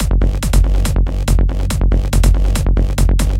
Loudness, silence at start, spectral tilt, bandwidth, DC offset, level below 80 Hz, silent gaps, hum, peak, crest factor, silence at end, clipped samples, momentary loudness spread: -16 LUFS; 0 s; -5.5 dB/octave; 15 kHz; under 0.1%; -14 dBFS; none; none; 0 dBFS; 12 dB; 0 s; under 0.1%; 3 LU